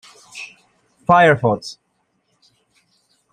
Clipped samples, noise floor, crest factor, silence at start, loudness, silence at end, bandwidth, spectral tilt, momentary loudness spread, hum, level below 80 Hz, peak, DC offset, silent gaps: under 0.1%; -67 dBFS; 18 dB; 0.35 s; -15 LUFS; 1.6 s; 10.5 kHz; -6 dB/octave; 24 LU; none; -58 dBFS; -2 dBFS; under 0.1%; none